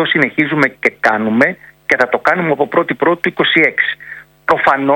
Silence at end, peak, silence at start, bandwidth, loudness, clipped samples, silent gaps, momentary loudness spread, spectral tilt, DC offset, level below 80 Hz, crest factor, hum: 0 s; 0 dBFS; 0 s; 17 kHz; -13 LUFS; 0.2%; none; 6 LU; -6 dB/octave; under 0.1%; -56 dBFS; 14 dB; none